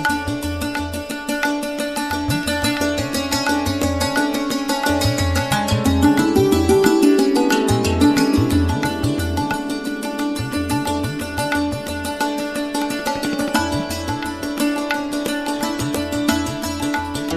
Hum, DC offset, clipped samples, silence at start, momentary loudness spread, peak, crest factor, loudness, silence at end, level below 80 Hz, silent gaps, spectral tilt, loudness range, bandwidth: none; under 0.1%; under 0.1%; 0 s; 9 LU; 0 dBFS; 20 dB; -20 LUFS; 0 s; -36 dBFS; none; -5 dB/octave; 6 LU; 14 kHz